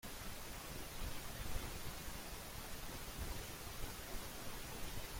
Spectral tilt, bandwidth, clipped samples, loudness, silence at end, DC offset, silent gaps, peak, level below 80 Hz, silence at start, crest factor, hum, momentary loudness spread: -3 dB/octave; 16.5 kHz; under 0.1%; -48 LUFS; 0 s; under 0.1%; none; -28 dBFS; -52 dBFS; 0.05 s; 18 dB; none; 2 LU